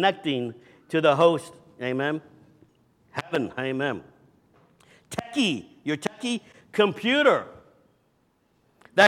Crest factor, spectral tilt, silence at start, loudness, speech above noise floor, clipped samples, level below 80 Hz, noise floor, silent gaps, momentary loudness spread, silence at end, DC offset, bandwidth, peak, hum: 24 dB; -4.5 dB/octave; 0 s; -26 LUFS; 42 dB; under 0.1%; -70 dBFS; -67 dBFS; none; 16 LU; 0 s; under 0.1%; 14.5 kHz; -4 dBFS; none